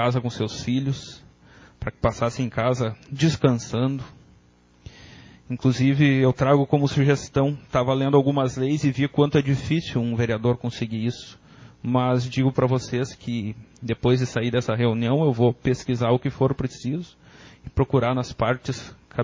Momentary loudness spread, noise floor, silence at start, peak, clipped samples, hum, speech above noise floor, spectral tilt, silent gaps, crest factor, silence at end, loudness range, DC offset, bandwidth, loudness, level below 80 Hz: 13 LU; -56 dBFS; 0 s; -4 dBFS; under 0.1%; none; 34 dB; -7 dB/octave; none; 18 dB; 0 s; 5 LU; under 0.1%; 7.6 kHz; -23 LUFS; -46 dBFS